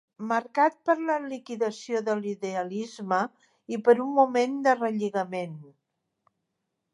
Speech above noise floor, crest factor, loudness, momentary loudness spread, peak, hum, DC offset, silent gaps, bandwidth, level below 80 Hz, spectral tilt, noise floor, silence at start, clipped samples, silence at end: 55 dB; 20 dB; -27 LUFS; 12 LU; -8 dBFS; none; under 0.1%; none; 11 kHz; -84 dBFS; -5.5 dB/octave; -81 dBFS; 0.2 s; under 0.1%; 1.25 s